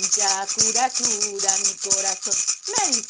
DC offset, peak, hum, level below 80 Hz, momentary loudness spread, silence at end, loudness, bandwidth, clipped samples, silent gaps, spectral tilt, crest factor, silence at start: under 0.1%; -2 dBFS; none; -66 dBFS; 3 LU; 0 s; -20 LUFS; 10.5 kHz; under 0.1%; none; 1 dB/octave; 20 dB; 0 s